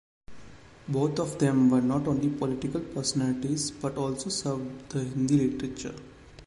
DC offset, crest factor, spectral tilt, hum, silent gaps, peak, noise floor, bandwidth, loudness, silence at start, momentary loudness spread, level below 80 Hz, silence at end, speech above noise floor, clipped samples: under 0.1%; 16 dB; -5.5 dB/octave; none; none; -12 dBFS; -49 dBFS; 11.5 kHz; -28 LUFS; 0.3 s; 12 LU; -56 dBFS; 0 s; 22 dB; under 0.1%